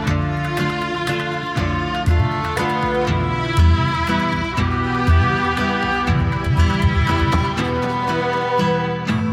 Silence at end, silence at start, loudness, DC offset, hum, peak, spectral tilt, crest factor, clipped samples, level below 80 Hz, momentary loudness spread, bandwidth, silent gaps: 0 s; 0 s; -19 LUFS; under 0.1%; none; -4 dBFS; -6.5 dB/octave; 14 dB; under 0.1%; -30 dBFS; 5 LU; 12.5 kHz; none